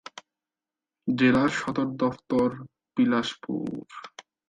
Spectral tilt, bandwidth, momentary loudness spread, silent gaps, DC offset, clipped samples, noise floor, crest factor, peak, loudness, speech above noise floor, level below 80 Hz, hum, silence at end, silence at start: -6 dB/octave; 9.2 kHz; 21 LU; none; under 0.1%; under 0.1%; under -90 dBFS; 18 dB; -10 dBFS; -26 LUFS; over 65 dB; -62 dBFS; none; 0.4 s; 0.15 s